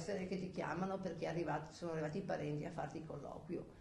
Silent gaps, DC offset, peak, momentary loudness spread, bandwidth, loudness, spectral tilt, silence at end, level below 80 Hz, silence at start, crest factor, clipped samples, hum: none; under 0.1%; -26 dBFS; 6 LU; 11.5 kHz; -44 LUFS; -6.5 dB/octave; 0 s; -66 dBFS; 0 s; 16 dB; under 0.1%; none